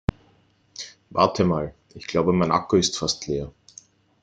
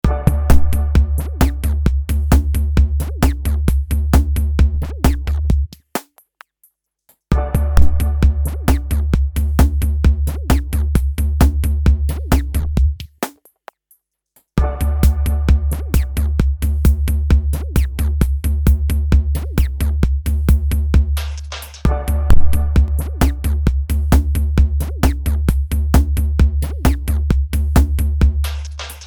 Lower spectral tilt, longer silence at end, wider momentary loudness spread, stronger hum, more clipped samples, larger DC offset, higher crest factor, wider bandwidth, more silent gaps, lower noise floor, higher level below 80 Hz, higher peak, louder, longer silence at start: second, -5 dB/octave vs -6.5 dB/octave; first, 0.75 s vs 0 s; first, 18 LU vs 5 LU; neither; neither; neither; first, 22 dB vs 14 dB; second, 9.4 kHz vs 20 kHz; neither; about the same, -60 dBFS vs -59 dBFS; second, -46 dBFS vs -16 dBFS; about the same, -2 dBFS vs 0 dBFS; second, -23 LUFS vs -18 LUFS; first, 0.8 s vs 0.05 s